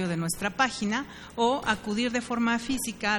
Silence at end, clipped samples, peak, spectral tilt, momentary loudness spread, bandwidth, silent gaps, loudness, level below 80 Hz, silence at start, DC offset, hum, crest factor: 0 s; under 0.1%; -8 dBFS; -4 dB/octave; 5 LU; 19 kHz; none; -28 LUFS; -54 dBFS; 0 s; under 0.1%; none; 20 dB